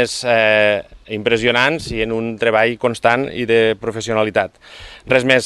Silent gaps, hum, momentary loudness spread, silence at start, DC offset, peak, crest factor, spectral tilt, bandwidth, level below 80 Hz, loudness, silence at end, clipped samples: none; none; 9 LU; 0 s; under 0.1%; 0 dBFS; 16 dB; -4.5 dB/octave; 12.5 kHz; -44 dBFS; -16 LUFS; 0 s; under 0.1%